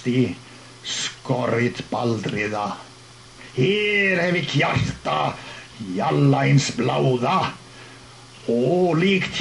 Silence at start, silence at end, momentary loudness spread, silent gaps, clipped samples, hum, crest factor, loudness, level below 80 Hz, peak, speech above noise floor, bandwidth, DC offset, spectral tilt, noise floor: 0 s; 0 s; 18 LU; none; under 0.1%; none; 16 dB; -21 LUFS; -50 dBFS; -6 dBFS; 24 dB; 11.5 kHz; under 0.1%; -5.5 dB/octave; -45 dBFS